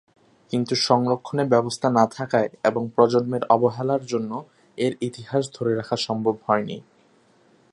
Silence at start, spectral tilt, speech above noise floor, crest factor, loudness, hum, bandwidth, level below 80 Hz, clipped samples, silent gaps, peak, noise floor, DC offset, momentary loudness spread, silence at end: 0.5 s; -5.5 dB/octave; 36 dB; 20 dB; -23 LUFS; none; 11.5 kHz; -66 dBFS; under 0.1%; none; -2 dBFS; -58 dBFS; under 0.1%; 9 LU; 0.95 s